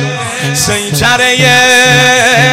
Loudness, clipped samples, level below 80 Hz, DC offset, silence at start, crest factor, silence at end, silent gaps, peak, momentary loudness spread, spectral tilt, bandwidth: -7 LUFS; 0.3%; -38 dBFS; under 0.1%; 0 s; 8 dB; 0 s; none; 0 dBFS; 9 LU; -2.5 dB/octave; 17 kHz